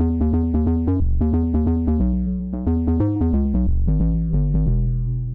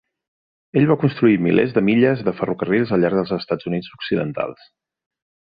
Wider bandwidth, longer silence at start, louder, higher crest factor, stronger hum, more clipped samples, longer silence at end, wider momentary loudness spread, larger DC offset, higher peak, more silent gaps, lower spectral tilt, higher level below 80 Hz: second, 2.3 kHz vs 5 kHz; second, 0 s vs 0.75 s; about the same, -21 LUFS vs -19 LUFS; second, 8 dB vs 18 dB; neither; neither; second, 0 s vs 1.05 s; second, 3 LU vs 9 LU; first, 0.3% vs under 0.1%; second, -12 dBFS vs -2 dBFS; neither; first, -13.5 dB/octave vs -10.5 dB/octave; first, -22 dBFS vs -56 dBFS